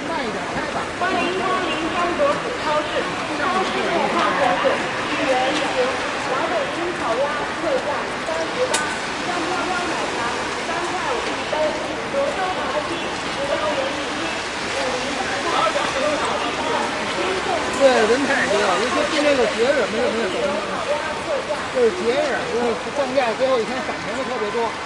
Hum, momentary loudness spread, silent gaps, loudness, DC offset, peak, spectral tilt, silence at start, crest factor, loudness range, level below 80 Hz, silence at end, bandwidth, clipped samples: none; 6 LU; none; -21 LUFS; under 0.1%; -4 dBFS; -3 dB/octave; 0 s; 18 dB; 4 LU; -50 dBFS; 0 s; 11.5 kHz; under 0.1%